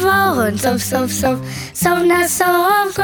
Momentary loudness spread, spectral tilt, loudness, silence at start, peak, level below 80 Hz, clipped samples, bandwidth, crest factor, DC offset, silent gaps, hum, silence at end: 5 LU; -4 dB/octave; -15 LUFS; 0 s; -2 dBFS; -44 dBFS; under 0.1%; over 20 kHz; 14 dB; under 0.1%; none; none; 0 s